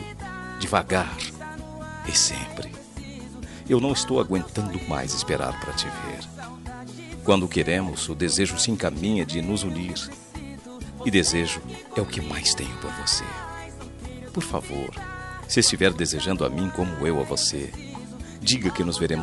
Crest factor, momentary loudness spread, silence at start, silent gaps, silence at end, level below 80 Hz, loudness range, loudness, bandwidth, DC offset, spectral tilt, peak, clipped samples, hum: 22 dB; 17 LU; 0 s; none; 0 s; -44 dBFS; 3 LU; -25 LUFS; 12 kHz; under 0.1%; -3.5 dB/octave; -4 dBFS; under 0.1%; none